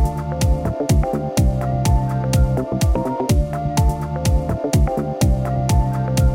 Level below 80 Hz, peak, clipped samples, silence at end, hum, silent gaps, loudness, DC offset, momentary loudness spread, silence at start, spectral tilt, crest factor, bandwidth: -22 dBFS; -4 dBFS; under 0.1%; 0 s; none; none; -19 LUFS; under 0.1%; 3 LU; 0 s; -6.5 dB/octave; 12 dB; 16.5 kHz